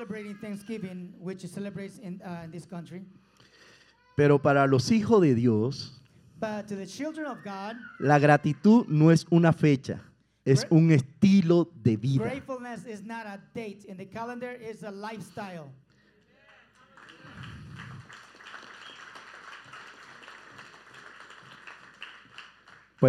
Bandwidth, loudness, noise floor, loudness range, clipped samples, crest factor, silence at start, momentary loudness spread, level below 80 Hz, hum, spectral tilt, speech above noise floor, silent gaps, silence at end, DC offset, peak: 12 kHz; -25 LUFS; -63 dBFS; 23 LU; under 0.1%; 22 dB; 0 s; 26 LU; -68 dBFS; none; -7.5 dB/octave; 38 dB; none; 0 s; under 0.1%; -6 dBFS